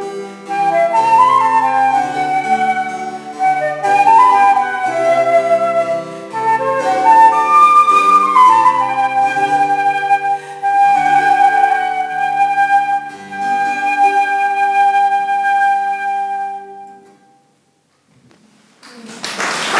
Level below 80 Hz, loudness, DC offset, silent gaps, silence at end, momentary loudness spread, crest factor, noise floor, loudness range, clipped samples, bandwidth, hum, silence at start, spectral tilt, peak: -66 dBFS; -13 LUFS; under 0.1%; none; 0 s; 12 LU; 14 dB; -58 dBFS; 8 LU; under 0.1%; 11 kHz; none; 0 s; -3 dB/octave; 0 dBFS